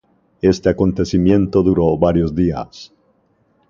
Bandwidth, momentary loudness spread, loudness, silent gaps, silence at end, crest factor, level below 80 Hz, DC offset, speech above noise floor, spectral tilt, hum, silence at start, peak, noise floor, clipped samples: 7.4 kHz; 5 LU; -16 LUFS; none; 0.85 s; 16 dB; -34 dBFS; under 0.1%; 44 dB; -8 dB/octave; none; 0.45 s; 0 dBFS; -60 dBFS; under 0.1%